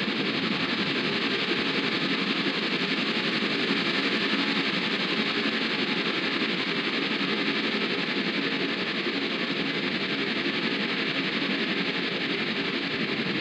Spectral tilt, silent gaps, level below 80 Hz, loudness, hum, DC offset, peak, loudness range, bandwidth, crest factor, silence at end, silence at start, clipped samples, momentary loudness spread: -4.5 dB/octave; none; -72 dBFS; -26 LUFS; none; under 0.1%; -12 dBFS; 2 LU; 10.5 kHz; 14 dB; 0 s; 0 s; under 0.1%; 3 LU